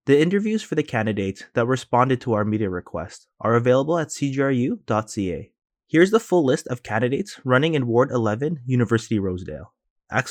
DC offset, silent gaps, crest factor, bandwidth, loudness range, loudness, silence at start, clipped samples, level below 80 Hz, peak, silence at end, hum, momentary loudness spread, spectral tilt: under 0.1%; 9.90-9.96 s; 18 dB; 14.5 kHz; 2 LU; -22 LUFS; 0.05 s; under 0.1%; -56 dBFS; -4 dBFS; 0 s; none; 10 LU; -6.5 dB/octave